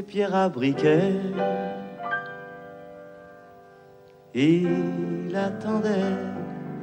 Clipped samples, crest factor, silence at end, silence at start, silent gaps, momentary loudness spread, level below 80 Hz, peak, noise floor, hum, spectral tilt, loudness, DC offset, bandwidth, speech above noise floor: under 0.1%; 18 dB; 0 s; 0 s; none; 22 LU; -66 dBFS; -8 dBFS; -51 dBFS; none; -7.5 dB/octave; -25 LUFS; under 0.1%; 9 kHz; 27 dB